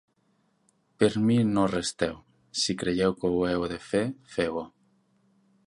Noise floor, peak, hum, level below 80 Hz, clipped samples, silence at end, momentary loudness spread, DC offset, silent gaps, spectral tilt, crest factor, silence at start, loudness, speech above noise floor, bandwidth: -70 dBFS; -8 dBFS; none; -54 dBFS; under 0.1%; 1 s; 9 LU; under 0.1%; none; -5 dB/octave; 20 dB; 1 s; -27 LUFS; 43 dB; 11.5 kHz